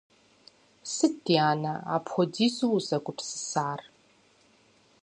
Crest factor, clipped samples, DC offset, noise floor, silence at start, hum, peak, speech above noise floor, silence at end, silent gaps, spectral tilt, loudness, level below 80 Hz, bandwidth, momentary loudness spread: 22 dB; under 0.1%; under 0.1%; -63 dBFS; 0.85 s; none; -8 dBFS; 35 dB; 1.15 s; none; -4.5 dB/octave; -28 LUFS; -76 dBFS; 11 kHz; 11 LU